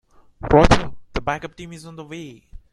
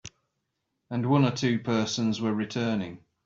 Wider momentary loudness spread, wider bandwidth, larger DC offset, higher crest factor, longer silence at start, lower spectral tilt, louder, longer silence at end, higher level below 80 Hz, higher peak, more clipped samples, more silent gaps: first, 23 LU vs 11 LU; first, 11 kHz vs 7.8 kHz; neither; about the same, 20 dB vs 18 dB; first, 0.45 s vs 0.05 s; about the same, -6 dB/octave vs -6 dB/octave; first, -19 LUFS vs -27 LUFS; second, 0.15 s vs 0.3 s; first, -30 dBFS vs -64 dBFS; first, 0 dBFS vs -10 dBFS; neither; neither